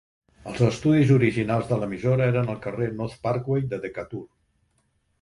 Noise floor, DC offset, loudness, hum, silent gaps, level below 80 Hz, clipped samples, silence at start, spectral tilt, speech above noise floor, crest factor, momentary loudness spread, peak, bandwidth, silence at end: -69 dBFS; under 0.1%; -24 LUFS; none; none; -54 dBFS; under 0.1%; 0.45 s; -8 dB/octave; 46 dB; 18 dB; 16 LU; -6 dBFS; 11 kHz; 0.95 s